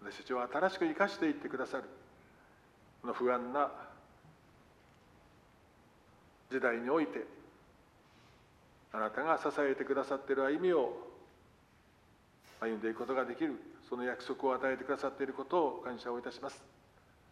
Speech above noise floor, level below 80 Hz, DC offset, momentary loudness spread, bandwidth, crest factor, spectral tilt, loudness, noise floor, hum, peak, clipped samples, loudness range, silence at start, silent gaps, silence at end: 30 dB; -74 dBFS; under 0.1%; 13 LU; 12.5 kHz; 22 dB; -5.5 dB/octave; -36 LUFS; -66 dBFS; none; -16 dBFS; under 0.1%; 5 LU; 0 s; none; 0.65 s